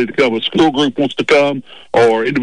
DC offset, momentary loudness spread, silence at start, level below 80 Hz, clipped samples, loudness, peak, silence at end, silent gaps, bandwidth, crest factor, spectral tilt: 0.7%; 6 LU; 0 s; -50 dBFS; under 0.1%; -14 LUFS; -4 dBFS; 0 s; none; 10.5 kHz; 10 dB; -5 dB/octave